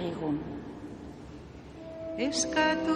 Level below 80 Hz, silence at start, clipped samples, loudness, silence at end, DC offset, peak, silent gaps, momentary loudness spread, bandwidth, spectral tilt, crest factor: -54 dBFS; 0 s; under 0.1%; -31 LUFS; 0 s; under 0.1%; -14 dBFS; none; 20 LU; 11.5 kHz; -3.5 dB/octave; 18 dB